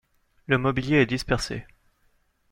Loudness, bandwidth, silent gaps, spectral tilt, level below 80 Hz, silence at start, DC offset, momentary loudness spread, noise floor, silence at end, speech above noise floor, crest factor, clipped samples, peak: -24 LUFS; 16.5 kHz; none; -5.5 dB/octave; -46 dBFS; 0.5 s; under 0.1%; 9 LU; -66 dBFS; 0.9 s; 42 dB; 20 dB; under 0.1%; -6 dBFS